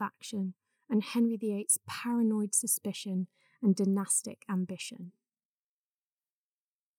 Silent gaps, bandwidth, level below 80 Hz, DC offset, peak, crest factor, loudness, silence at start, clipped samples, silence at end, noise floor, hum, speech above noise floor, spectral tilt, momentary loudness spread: none; 19 kHz; under -90 dBFS; under 0.1%; -14 dBFS; 20 dB; -31 LUFS; 0 s; under 0.1%; 1.9 s; under -90 dBFS; none; over 59 dB; -4.5 dB/octave; 12 LU